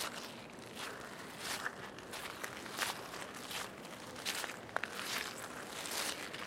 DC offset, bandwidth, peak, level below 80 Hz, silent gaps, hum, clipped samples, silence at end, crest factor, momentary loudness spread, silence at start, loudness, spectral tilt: under 0.1%; 16.5 kHz; -16 dBFS; -72 dBFS; none; none; under 0.1%; 0 s; 28 dB; 9 LU; 0 s; -42 LUFS; -1.5 dB/octave